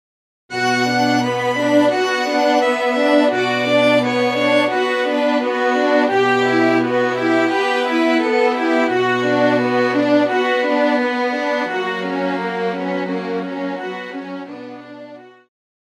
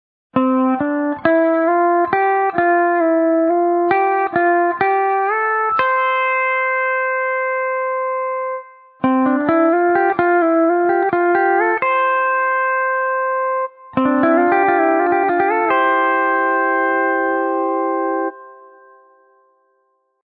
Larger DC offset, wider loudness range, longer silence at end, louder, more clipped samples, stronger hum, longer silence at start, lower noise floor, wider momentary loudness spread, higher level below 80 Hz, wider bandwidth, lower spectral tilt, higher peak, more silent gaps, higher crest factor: neither; first, 7 LU vs 3 LU; second, 0.65 s vs 1.7 s; about the same, -17 LUFS vs -16 LUFS; neither; neither; first, 0.5 s vs 0.35 s; second, -38 dBFS vs -65 dBFS; first, 10 LU vs 5 LU; second, -70 dBFS vs -62 dBFS; first, 13.5 kHz vs 4.6 kHz; second, -5 dB/octave vs -9.5 dB/octave; second, -4 dBFS vs 0 dBFS; neither; about the same, 14 dB vs 16 dB